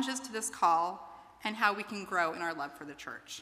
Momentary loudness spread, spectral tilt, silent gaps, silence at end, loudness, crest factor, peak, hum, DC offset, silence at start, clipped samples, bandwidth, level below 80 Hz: 16 LU; -2 dB/octave; none; 0 s; -33 LUFS; 22 dB; -12 dBFS; none; under 0.1%; 0 s; under 0.1%; 15.5 kHz; -74 dBFS